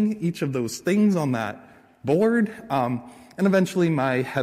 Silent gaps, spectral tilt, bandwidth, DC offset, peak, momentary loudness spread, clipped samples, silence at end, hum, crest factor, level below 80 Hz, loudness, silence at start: none; -6.5 dB/octave; 15 kHz; under 0.1%; -10 dBFS; 12 LU; under 0.1%; 0 s; none; 14 dB; -62 dBFS; -23 LUFS; 0 s